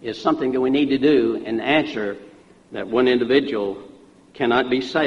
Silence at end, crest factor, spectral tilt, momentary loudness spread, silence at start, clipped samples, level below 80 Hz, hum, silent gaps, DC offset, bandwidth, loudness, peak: 0 s; 18 dB; -6 dB/octave; 12 LU; 0 s; under 0.1%; -56 dBFS; none; none; under 0.1%; 7.8 kHz; -20 LUFS; -4 dBFS